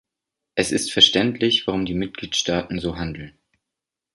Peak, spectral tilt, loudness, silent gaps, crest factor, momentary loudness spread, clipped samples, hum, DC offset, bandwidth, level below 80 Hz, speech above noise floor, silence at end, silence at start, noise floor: 0 dBFS; -3.5 dB/octave; -20 LUFS; none; 22 dB; 14 LU; under 0.1%; none; under 0.1%; 11.5 kHz; -46 dBFS; 64 dB; 0.85 s; 0.55 s; -85 dBFS